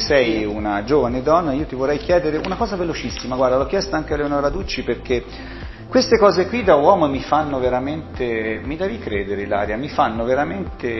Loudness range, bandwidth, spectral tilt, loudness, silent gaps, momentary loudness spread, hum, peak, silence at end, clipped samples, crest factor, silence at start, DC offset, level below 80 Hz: 4 LU; 6.2 kHz; -6 dB/octave; -19 LUFS; none; 10 LU; none; 0 dBFS; 0 s; under 0.1%; 18 dB; 0 s; under 0.1%; -36 dBFS